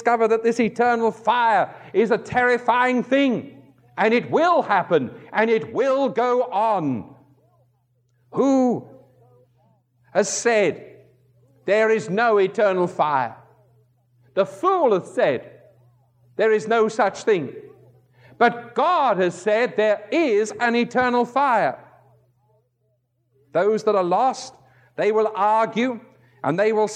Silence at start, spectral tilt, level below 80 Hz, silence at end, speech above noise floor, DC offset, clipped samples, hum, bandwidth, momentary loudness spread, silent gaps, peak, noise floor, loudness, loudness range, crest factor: 0 s; -5 dB/octave; -68 dBFS; 0 s; 49 dB; under 0.1%; under 0.1%; none; 10 kHz; 8 LU; none; -4 dBFS; -69 dBFS; -20 LUFS; 4 LU; 18 dB